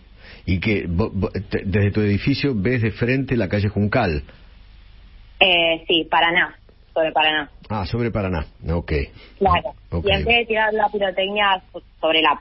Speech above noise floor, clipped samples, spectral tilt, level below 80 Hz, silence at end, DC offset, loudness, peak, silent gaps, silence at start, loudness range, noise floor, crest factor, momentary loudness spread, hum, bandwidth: 25 dB; under 0.1%; -10 dB/octave; -36 dBFS; 0 s; under 0.1%; -20 LUFS; 0 dBFS; none; 0.25 s; 3 LU; -45 dBFS; 20 dB; 10 LU; none; 5.8 kHz